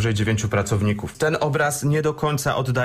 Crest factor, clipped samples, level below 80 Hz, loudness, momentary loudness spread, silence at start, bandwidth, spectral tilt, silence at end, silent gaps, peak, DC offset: 12 dB; under 0.1%; -44 dBFS; -22 LUFS; 2 LU; 0 s; 15.5 kHz; -5.5 dB/octave; 0 s; none; -8 dBFS; under 0.1%